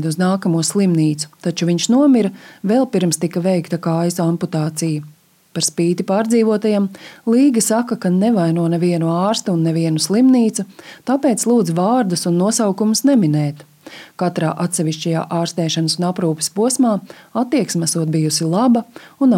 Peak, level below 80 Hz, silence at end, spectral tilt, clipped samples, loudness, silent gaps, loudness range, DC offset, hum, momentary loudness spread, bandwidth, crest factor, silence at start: -4 dBFS; -72 dBFS; 0 s; -5.5 dB/octave; under 0.1%; -17 LUFS; none; 3 LU; under 0.1%; none; 9 LU; 16.5 kHz; 12 dB; 0 s